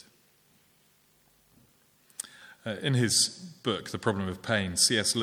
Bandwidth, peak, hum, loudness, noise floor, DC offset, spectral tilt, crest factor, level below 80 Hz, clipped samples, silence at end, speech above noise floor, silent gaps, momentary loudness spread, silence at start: 19.5 kHz; -10 dBFS; none; -27 LUFS; -65 dBFS; under 0.1%; -3 dB/octave; 22 dB; -66 dBFS; under 0.1%; 0 s; 37 dB; none; 18 LU; 2.35 s